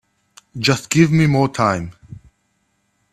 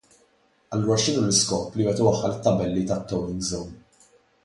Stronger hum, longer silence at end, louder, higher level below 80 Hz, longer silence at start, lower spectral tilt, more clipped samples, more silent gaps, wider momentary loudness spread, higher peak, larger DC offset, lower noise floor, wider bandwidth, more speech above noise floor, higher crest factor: neither; first, 0.95 s vs 0.7 s; first, -16 LUFS vs -24 LUFS; about the same, -50 dBFS vs -50 dBFS; second, 0.55 s vs 0.7 s; about the same, -5.5 dB/octave vs -4.5 dB/octave; neither; neither; first, 15 LU vs 9 LU; first, 0 dBFS vs -4 dBFS; neither; about the same, -66 dBFS vs -63 dBFS; first, 13.5 kHz vs 11.5 kHz; first, 51 dB vs 39 dB; about the same, 18 dB vs 20 dB